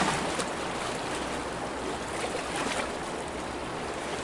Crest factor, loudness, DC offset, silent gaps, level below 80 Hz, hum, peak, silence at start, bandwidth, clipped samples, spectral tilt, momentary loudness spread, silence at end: 18 dB; -32 LUFS; under 0.1%; none; -50 dBFS; none; -14 dBFS; 0 s; 11.5 kHz; under 0.1%; -3.5 dB/octave; 5 LU; 0 s